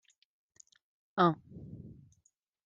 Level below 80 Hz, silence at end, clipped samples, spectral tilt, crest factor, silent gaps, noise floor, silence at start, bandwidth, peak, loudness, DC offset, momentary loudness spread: -70 dBFS; 0.75 s; under 0.1%; -7 dB/octave; 26 dB; none; -75 dBFS; 1.15 s; 7.6 kHz; -12 dBFS; -31 LUFS; under 0.1%; 22 LU